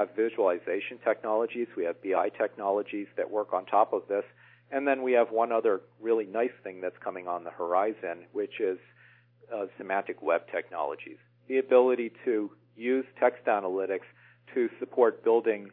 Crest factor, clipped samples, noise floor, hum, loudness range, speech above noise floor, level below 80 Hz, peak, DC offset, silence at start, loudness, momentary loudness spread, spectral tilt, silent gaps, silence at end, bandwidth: 20 dB; under 0.1%; -60 dBFS; 60 Hz at -60 dBFS; 5 LU; 31 dB; under -90 dBFS; -10 dBFS; under 0.1%; 0 s; -29 LUFS; 11 LU; -9 dB/octave; none; 0.05 s; 3.9 kHz